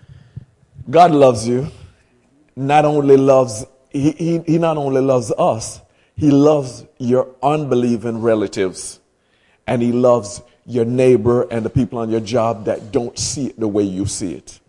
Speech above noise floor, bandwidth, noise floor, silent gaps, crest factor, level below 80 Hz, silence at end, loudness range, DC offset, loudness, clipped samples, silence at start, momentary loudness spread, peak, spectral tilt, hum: 43 dB; 11.5 kHz; -59 dBFS; none; 16 dB; -50 dBFS; 0.15 s; 4 LU; under 0.1%; -16 LUFS; under 0.1%; 0.35 s; 15 LU; 0 dBFS; -6 dB/octave; none